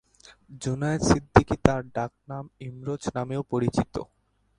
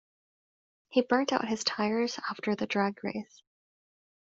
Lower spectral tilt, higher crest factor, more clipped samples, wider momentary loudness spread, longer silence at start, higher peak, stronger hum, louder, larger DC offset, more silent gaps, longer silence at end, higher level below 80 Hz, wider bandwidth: first, -6 dB/octave vs -3 dB/octave; about the same, 26 dB vs 22 dB; neither; first, 17 LU vs 10 LU; second, 0.5 s vs 0.9 s; first, 0 dBFS vs -10 dBFS; neither; first, -26 LUFS vs -30 LUFS; neither; neither; second, 0.55 s vs 1.05 s; first, -42 dBFS vs -72 dBFS; first, 11.5 kHz vs 8 kHz